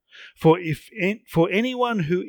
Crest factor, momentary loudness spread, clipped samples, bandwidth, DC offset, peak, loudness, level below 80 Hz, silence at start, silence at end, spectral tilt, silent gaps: 18 dB; 6 LU; under 0.1%; 19.5 kHz; under 0.1%; -6 dBFS; -22 LUFS; -54 dBFS; 0.15 s; 0 s; -7 dB/octave; none